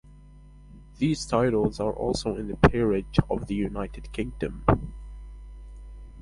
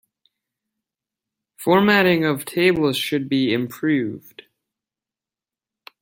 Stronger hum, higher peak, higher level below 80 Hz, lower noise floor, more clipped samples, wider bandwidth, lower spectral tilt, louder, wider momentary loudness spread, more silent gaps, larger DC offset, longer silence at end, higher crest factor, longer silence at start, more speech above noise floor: first, 50 Hz at -40 dBFS vs none; about the same, -2 dBFS vs -2 dBFS; first, -38 dBFS vs -60 dBFS; second, -49 dBFS vs under -90 dBFS; neither; second, 11.5 kHz vs 16.5 kHz; about the same, -6.5 dB/octave vs -5.5 dB/octave; second, -26 LUFS vs -19 LUFS; first, 24 LU vs 9 LU; neither; neither; second, 0 s vs 1.8 s; about the same, 24 dB vs 20 dB; second, 0.05 s vs 1.6 s; second, 24 dB vs over 71 dB